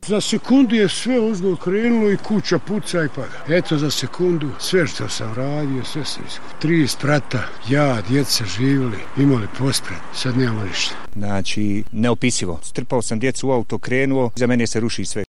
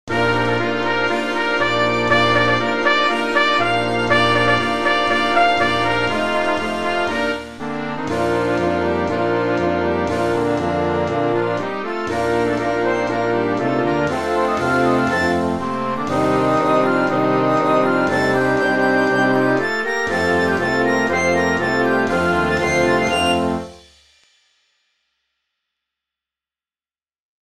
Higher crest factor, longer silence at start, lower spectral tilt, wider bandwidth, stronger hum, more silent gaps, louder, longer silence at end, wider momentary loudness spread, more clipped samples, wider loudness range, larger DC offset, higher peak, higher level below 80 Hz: about the same, 14 dB vs 16 dB; about the same, 0 s vs 0.05 s; about the same, -5 dB/octave vs -5 dB/octave; second, 12.5 kHz vs 15 kHz; neither; neither; about the same, -20 LUFS vs -18 LUFS; second, 0 s vs 0.15 s; first, 8 LU vs 5 LU; neither; about the same, 3 LU vs 4 LU; first, 5% vs 0.8%; second, -6 dBFS vs -2 dBFS; second, -50 dBFS vs -44 dBFS